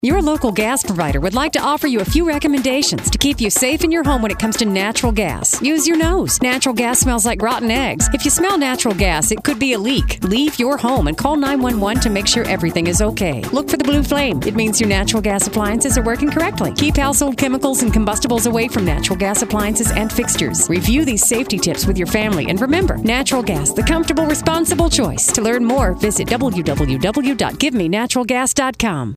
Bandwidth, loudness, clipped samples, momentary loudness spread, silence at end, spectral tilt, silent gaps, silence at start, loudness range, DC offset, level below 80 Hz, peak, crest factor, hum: 16 kHz; -16 LUFS; under 0.1%; 3 LU; 0 s; -3.5 dB/octave; none; 0.05 s; 1 LU; under 0.1%; -28 dBFS; 0 dBFS; 16 dB; none